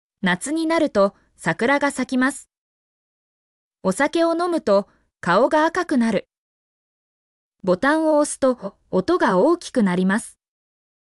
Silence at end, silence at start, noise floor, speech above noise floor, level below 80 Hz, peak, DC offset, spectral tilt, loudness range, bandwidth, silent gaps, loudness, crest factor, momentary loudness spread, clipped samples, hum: 0.9 s; 0.25 s; under -90 dBFS; over 71 dB; -60 dBFS; -6 dBFS; under 0.1%; -5 dB/octave; 3 LU; 12 kHz; 2.58-3.71 s, 6.38-7.52 s; -20 LUFS; 14 dB; 9 LU; under 0.1%; none